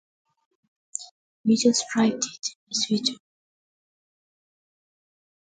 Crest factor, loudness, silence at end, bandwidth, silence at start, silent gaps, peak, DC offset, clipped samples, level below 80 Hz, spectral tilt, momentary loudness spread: 22 dB; -24 LUFS; 2.3 s; 9.4 kHz; 1 s; 1.11-1.44 s, 2.55-2.67 s; -6 dBFS; under 0.1%; under 0.1%; -72 dBFS; -3 dB/octave; 16 LU